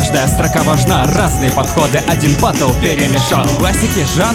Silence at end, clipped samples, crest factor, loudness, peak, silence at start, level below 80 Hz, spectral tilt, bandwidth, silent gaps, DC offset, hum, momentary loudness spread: 0 s; under 0.1%; 12 dB; -12 LUFS; 0 dBFS; 0 s; -24 dBFS; -4.5 dB/octave; 17.5 kHz; none; under 0.1%; none; 1 LU